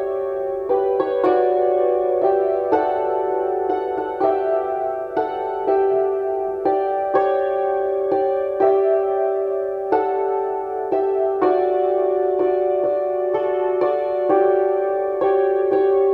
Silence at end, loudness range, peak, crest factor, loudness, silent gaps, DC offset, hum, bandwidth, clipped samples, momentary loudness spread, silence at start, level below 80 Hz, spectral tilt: 0 s; 2 LU; -4 dBFS; 14 dB; -20 LUFS; none; under 0.1%; none; 4.4 kHz; under 0.1%; 6 LU; 0 s; -58 dBFS; -8 dB/octave